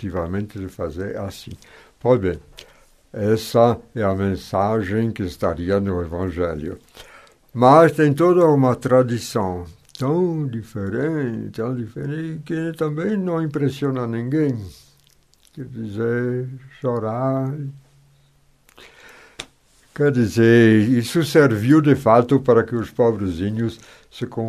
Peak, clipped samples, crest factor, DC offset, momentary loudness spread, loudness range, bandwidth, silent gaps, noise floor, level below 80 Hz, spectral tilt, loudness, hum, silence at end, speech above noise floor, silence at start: 0 dBFS; under 0.1%; 20 dB; under 0.1%; 18 LU; 10 LU; 14 kHz; none; -57 dBFS; -48 dBFS; -7.5 dB/octave; -19 LUFS; none; 0 s; 38 dB; 0 s